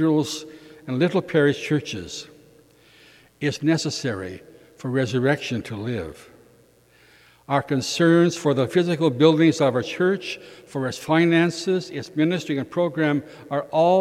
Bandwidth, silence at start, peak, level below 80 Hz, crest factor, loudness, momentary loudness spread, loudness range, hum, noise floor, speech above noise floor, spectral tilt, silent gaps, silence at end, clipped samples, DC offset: 14 kHz; 0 s; -4 dBFS; -62 dBFS; 20 dB; -22 LUFS; 15 LU; 8 LU; none; -56 dBFS; 34 dB; -6 dB/octave; none; 0 s; under 0.1%; under 0.1%